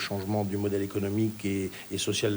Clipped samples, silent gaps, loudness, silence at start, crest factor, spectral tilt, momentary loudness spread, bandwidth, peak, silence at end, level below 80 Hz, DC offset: under 0.1%; none; -30 LUFS; 0 s; 14 dB; -5 dB/octave; 3 LU; over 20 kHz; -16 dBFS; 0 s; -64 dBFS; under 0.1%